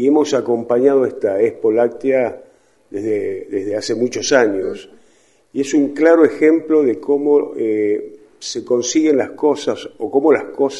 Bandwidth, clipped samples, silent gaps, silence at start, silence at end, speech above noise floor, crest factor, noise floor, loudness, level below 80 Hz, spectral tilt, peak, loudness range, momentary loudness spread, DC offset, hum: 11 kHz; under 0.1%; none; 0 s; 0 s; 39 dB; 16 dB; -55 dBFS; -16 LUFS; -62 dBFS; -4.5 dB/octave; 0 dBFS; 4 LU; 11 LU; under 0.1%; none